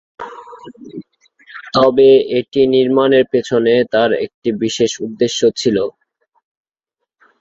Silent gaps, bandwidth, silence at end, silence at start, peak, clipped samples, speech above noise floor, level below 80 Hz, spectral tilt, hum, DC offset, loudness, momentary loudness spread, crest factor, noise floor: 4.34-4.42 s; 7.8 kHz; 1.5 s; 0.2 s; -2 dBFS; under 0.1%; 65 dB; -56 dBFS; -4.5 dB/octave; none; under 0.1%; -14 LUFS; 23 LU; 14 dB; -78 dBFS